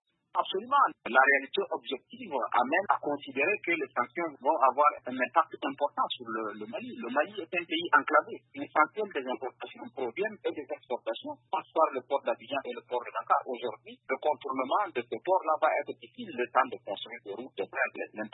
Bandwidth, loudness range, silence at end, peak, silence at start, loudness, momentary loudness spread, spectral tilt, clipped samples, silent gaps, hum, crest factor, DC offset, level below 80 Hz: 4.1 kHz; 5 LU; 0.05 s; -8 dBFS; 0.35 s; -30 LUFS; 13 LU; -7.5 dB/octave; under 0.1%; none; none; 22 dB; under 0.1%; -86 dBFS